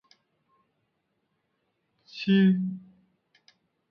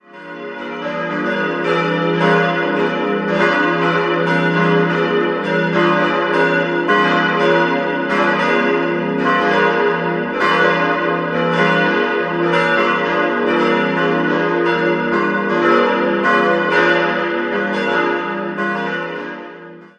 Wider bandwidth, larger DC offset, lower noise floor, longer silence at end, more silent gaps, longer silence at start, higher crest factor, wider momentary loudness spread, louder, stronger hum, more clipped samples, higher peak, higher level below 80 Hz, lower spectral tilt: second, 6 kHz vs 9.4 kHz; neither; first, -77 dBFS vs -36 dBFS; first, 1.1 s vs 0.1 s; neither; first, 2.15 s vs 0.15 s; about the same, 18 dB vs 16 dB; first, 22 LU vs 7 LU; second, -25 LUFS vs -16 LUFS; neither; neither; second, -12 dBFS vs 0 dBFS; second, -76 dBFS vs -58 dBFS; first, -8.5 dB/octave vs -6.5 dB/octave